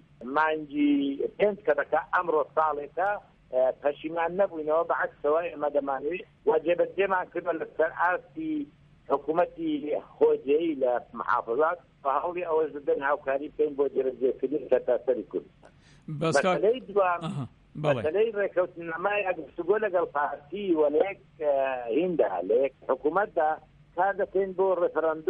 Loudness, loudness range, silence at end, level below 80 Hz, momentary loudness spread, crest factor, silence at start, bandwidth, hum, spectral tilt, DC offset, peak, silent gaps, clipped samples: -28 LUFS; 1 LU; 0 s; -64 dBFS; 7 LU; 16 dB; 0.2 s; 10 kHz; none; -6.5 dB/octave; under 0.1%; -12 dBFS; none; under 0.1%